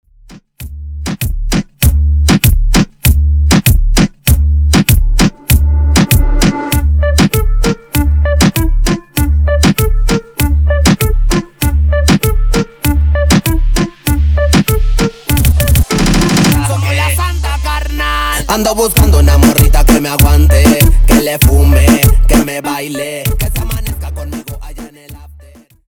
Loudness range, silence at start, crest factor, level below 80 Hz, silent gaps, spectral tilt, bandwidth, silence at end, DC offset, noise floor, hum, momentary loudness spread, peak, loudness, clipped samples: 4 LU; 0.3 s; 10 dB; -12 dBFS; none; -5 dB/octave; over 20 kHz; 0.55 s; 0.2%; -39 dBFS; none; 10 LU; 0 dBFS; -11 LUFS; under 0.1%